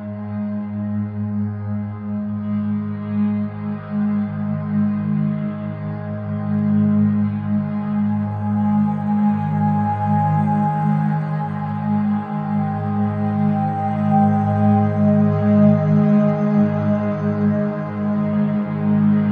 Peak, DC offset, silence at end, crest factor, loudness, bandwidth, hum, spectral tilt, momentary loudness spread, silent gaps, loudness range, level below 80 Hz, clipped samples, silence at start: -4 dBFS; under 0.1%; 0 s; 14 dB; -20 LUFS; 3.7 kHz; none; -11.5 dB/octave; 9 LU; none; 7 LU; -56 dBFS; under 0.1%; 0 s